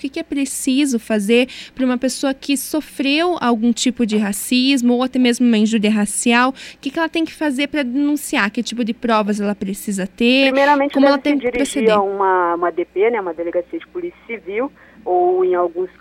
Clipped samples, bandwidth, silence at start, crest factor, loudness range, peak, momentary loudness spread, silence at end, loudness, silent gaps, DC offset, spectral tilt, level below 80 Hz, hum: under 0.1%; 16 kHz; 0 s; 16 dB; 4 LU; -2 dBFS; 10 LU; 0.15 s; -17 LUFS; none; under 0.1%; -4 dB/octave; -54 dBFS; none